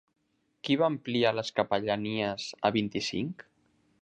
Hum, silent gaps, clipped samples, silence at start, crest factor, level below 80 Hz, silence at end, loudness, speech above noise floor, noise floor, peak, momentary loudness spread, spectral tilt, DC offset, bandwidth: none; none; under 0.1%; 0.65 s; 20 dB; -66 dBFS; 0.6 s; -30 LUFS; 40 dB; -69 dBFS; -10 dBFS; 8 LU; -5 dB/octave; under 0.1%; 9.6 kHz